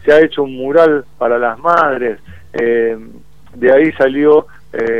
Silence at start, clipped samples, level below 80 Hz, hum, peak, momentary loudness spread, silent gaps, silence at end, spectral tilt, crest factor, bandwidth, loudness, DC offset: 0.05 s; under 0.1%; -48 dBFS; none; 0 dBFS; 11 LU; none; 0 s; -7 dB/octave; 12 dB; 7 kHz; -13 LUFS; 2%